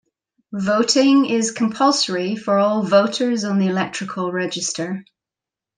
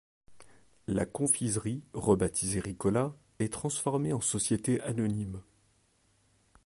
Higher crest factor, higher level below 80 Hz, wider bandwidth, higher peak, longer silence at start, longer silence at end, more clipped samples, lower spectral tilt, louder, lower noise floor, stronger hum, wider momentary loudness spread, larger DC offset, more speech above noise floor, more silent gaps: second, 16 dB vs 22 dB; second, -68 dBFS vs -54 dBFS; second, 10 kHz vs 11.5 kHz; first, -2 dBFS vs -10 dBFS; first, 0.5 s vs 0.3 s; second, 0.75 s vs 1.25 s; neither; about the same, -4 dB/octave vs -5 dB/octave; first, -19 LUFS vs -31 LUFS; first, -88 dBFS vs -69 dBFS; neither; about the same, 10 LU vs 9 LU; neither; first, 69 dB vs 39 dB; neither